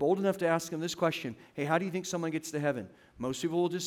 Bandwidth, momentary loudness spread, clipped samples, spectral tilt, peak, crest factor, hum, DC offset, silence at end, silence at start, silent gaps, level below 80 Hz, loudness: 17 kHz; 10 LU; under 0.1%; -5 dB/octave; -14 dBFS; 18 dB; none; under 0.1%; 0 s; 0 s; none; -70 dBFS; -32 LUFS